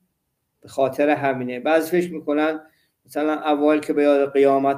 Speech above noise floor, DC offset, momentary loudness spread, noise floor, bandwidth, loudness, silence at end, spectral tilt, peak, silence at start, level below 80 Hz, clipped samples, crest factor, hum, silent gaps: 55 dB; under 0.1%; 8 LU; -74 dBFS; 15.5 kHz; -20 LUFS; 0 s; -6 dB/octave; -6 dBFS; 0.65 s; -70 dBFS; under 0.1%; 16 dB; none; none